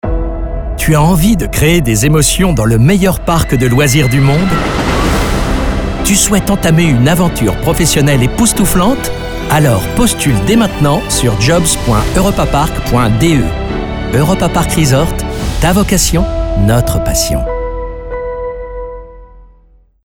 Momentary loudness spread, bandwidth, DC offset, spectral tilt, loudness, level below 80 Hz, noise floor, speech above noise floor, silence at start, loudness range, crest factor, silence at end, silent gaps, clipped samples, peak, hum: 10 LU; 19.5 kHz; under 0.1%; -5 dB/octave; -11 LUFS; -20 dBFS; -45 dBFS; 36 dB; 0.05 s; 3 LU; 10 dB; 0.6 s; none; under 0.1%; 0 dBFS; none